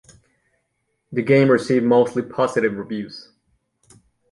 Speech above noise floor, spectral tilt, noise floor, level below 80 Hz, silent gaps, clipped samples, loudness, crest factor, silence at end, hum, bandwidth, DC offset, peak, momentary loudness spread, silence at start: 54 dB; -7 dB/octave; -72 dBFS; -64 dBFS; none; under 0.1%; -19 LUFS; 18 dB; 1.1 s; none; 11.5 kHz; under 0.1%; -2 dBFS; 14 LU; 1.1 s